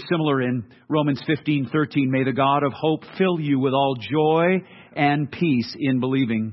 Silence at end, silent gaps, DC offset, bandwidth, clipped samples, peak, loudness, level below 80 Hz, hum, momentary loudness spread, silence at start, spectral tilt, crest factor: 0 s; none; under 0.1%; 6 kHz; under 0.1%; -4 dBFS; -22 LUFS; -64 dBFS; none; 5 LU; 0 s; -9 dB/octave; 16 dB